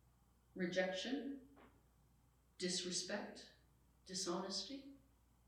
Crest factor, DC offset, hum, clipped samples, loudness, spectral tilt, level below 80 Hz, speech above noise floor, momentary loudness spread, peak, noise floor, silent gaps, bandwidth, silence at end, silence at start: 22 dB; under 0.1%; none; under 0.1%; -44 LUFS; -3 dB/octave; -76 dBFS; 29 dB; 17 LU; -24 dBFS; -73 dBFS; none; 15 kHz; 0.5 s; 0.55 s